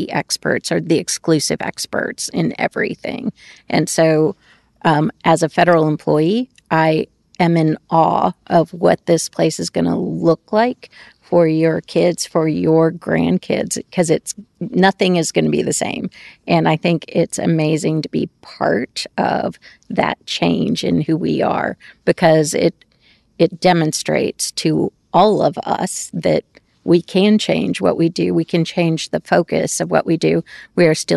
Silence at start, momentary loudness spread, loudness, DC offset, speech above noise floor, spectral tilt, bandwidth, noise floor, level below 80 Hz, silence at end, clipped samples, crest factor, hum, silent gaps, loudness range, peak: 0 s; 8 LU; -17 LUFS; under 0.1%; 39 dB; -5 dB/octave; 12.5 kHz; -55 dBFS; -52 dBFS; 0 s; under 0.1%; 14 dB; none; none; 3 LU; -2 dBFS